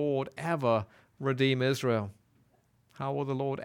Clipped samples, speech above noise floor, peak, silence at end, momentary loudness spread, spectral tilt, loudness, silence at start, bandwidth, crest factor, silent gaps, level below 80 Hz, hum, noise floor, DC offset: under 0.1%; 38 dB; -14 dBFS; 0 s; 10 LU; -6.5 dB/octave; -31 LUFS; 0 s; 16.5 kHz; 18 dB; none; -72 dBFS; none; -68 dBFS; under 0.1%